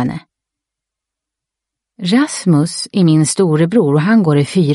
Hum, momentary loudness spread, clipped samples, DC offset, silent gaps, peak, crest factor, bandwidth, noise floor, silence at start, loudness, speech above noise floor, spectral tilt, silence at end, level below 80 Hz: none; 7 LU; under 0.1%; under 0.1%; none; -2 dBFS; 12 dB; 11.5 kHz; -83 dBFS; 0 s; -13 LUFS; 70 dB; -6 dB/octave; 0 s; -56 dBFS